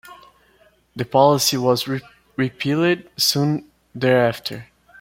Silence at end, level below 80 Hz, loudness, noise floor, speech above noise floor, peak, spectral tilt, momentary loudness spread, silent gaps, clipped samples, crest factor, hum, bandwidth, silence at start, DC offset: 0.35 s; -58 dBFS; -19 LUFS; -57 dBFS; 38 dB; -2 dBFS; -4.5 dB/octave; 15 LU; none; under 0.1%; 20 dB; none; 16.5 kHz; 0.05 s; under 0.1%